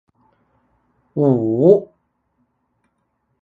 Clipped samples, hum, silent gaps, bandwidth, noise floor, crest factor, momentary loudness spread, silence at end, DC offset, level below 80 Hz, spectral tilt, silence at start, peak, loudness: under 0.1%; none; none; 4.1 kHz; -69 dBFS; 20 dB; 7 LU; 1.55 s; under 0.1%; -62 dBFS; -12 dB/octave; 1.15 s; 0 dBFS; -16 LUFS